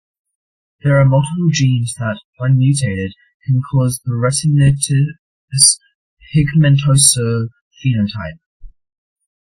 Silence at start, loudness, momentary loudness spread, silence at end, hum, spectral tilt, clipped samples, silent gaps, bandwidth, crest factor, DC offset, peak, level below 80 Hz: 0.85 s; -14 LUFS; 13 LU; 0.8 s; none; -4.5 dB/octave; under 0.1%; 2.24-2.33 s, 3.34-3.40 s, 5.19-5.48 s, 5.95-6.17 s, 7.61-7.71 s, 8.46-8.60 s; 15.5 kHz; 16 dB; under 0.1%; 0 dBFS; -42 dBFS